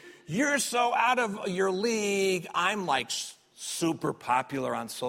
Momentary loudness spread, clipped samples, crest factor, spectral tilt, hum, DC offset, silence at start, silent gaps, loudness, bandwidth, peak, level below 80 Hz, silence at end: 8 LU; under 0.1%; 18 dB; -3 dB/octave; none; under 0.1%; 0.05 s; none; -28 LUFS; 16 kHz; -10 dBFS; -72 dBFS; 0 s